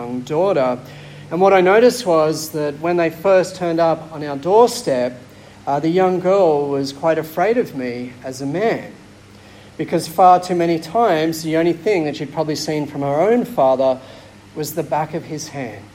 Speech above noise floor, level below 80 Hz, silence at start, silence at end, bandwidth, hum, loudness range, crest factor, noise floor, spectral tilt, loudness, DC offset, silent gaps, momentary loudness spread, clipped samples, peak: 25 dB; -56 dBFS; 0 s; 0.1 s; 16.5 kHz; none; 4 LU; 16 dB; -42 dBFS; -5.5 dB/octave; -17 LUFS; under 0.1%; none; 14 LU; under 0.1%; -2 dBFS